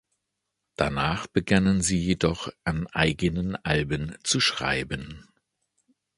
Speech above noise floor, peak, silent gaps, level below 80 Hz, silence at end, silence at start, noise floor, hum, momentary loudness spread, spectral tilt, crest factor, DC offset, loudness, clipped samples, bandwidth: 56 dB; -4 dBFS; none; -44 dBFS; 0.95 s; 0.8 s; -82 dBFS; none; 8 LU; -4.5 dB/octave; 22 dB; under 0.1%; -25 LUFS; under 0.1%; 11.5 kHz